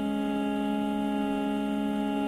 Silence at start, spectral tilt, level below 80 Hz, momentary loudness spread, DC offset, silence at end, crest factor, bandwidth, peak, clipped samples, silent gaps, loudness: 0 s; -6.5 dB/octave; -56 dBFS; 0 LU; under 0.1%; 0 s; 10 dB; 13.5 kHz; -18 dBFS; under 0.1%; none; -29 LUFS